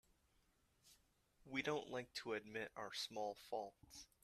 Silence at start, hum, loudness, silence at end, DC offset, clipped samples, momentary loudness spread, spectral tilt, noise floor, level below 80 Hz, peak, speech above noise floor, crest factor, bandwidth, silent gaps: 0.85 s; none; -47 LUFS; 0.2 s; under 0.1%; under 0.1%; 8 LU; -3.5 dB/octave; -79 dBFS; -80 dBFS; -28 dBFS; 31 dB; 22 dB; 14.5 kHz; none